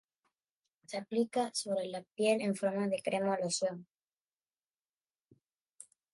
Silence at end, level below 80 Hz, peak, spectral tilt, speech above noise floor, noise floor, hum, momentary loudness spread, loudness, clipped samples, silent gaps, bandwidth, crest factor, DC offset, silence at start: 0.3 s; -86 dBFS; -18 dBFS; -4 dB/octave; over 56 dB; under -90 dBFS; none; 10 LU; -34 LUFS; under 0.1%; 4.04-4.08 s, 4.23-4.27 s, 4.33-4.37 s; 11.5 kHz; 18 dB; under 0.1%; 0.9 s